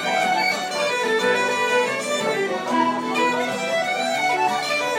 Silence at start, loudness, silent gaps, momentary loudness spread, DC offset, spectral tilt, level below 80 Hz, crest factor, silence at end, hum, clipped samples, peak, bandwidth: 0 s; -21 LUFS; none; 3 LU; under 0.1%; -2.5 dB/octave; -80 dBFS; 14 dB; 0 s; none; under 0.1%; -8 dBFS; 16.5 kHz